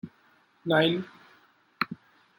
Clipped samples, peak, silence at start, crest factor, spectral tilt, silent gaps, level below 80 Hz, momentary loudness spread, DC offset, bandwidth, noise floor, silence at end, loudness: under 0.1%; -10 dBFS; 0.05 s; 22 dB; -7 dB/octave; none; -72 dBFS; 22 LU; under 0.1%; 16.5 kHz; -63 dBFS; 0.45 s; -28 LUFS